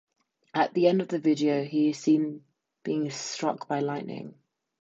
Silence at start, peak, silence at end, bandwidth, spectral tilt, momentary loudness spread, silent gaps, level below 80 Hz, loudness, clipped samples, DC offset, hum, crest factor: 0.55 s; -10 dBFS; 0.5 s; 8 kHz; -5.5 dB/octave; 15 LU; none; -80 dBFS; -27 LUFS; under 0.1%; under 0.1%; none; 18 dB